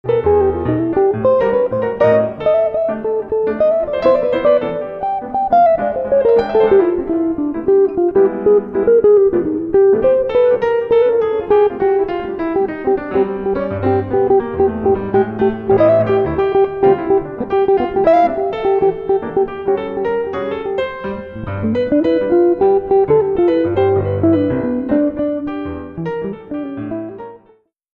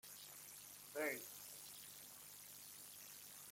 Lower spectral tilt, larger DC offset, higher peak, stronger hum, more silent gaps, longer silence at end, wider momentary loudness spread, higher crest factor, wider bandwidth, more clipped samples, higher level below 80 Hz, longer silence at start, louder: first, -9.5 dB/octave vs -1.5 dB/octave; neither; first, -2 dBFS vs -32 dBFS; second, none vs 50 Hz at -75 dBFS; neither; first, 0.6 s vs 0 s; about the same, 9 LU vs 10 LU; second, 14 dB vs 22 dB; second, 5.2 kHz vs 16.5 kHz; neither; first, -42 dBFS vs -88 dBFS; about the same, 0.05 s vs 0.05 s; first, -15 LUFS vs -51 LUFS